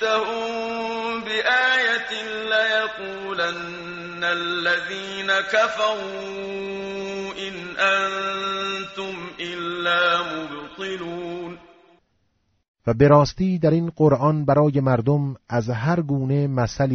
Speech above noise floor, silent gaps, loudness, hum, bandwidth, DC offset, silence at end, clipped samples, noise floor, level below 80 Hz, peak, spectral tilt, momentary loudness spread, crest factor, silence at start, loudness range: 47 dB; 12.68-12.74 s; -22 LUFS; none; 8 kHz; under 0.1%; 0 s; under 0.1%; -68 dBFS; -52 dBFS; -4 dBFS; -4 dB/octave; 13 LU; 20 dB; 0 s; 6 LU